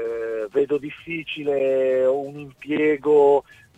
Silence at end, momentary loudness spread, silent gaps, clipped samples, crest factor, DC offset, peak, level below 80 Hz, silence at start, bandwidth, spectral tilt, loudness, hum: 0.35 s; 13 LU; none; under 0.1%; 14 dB; under 0.1%; -6 dBFS; -62 dBFS; 0 s; 8 kHz; -6.5 dB/octave; -21 LUFS; none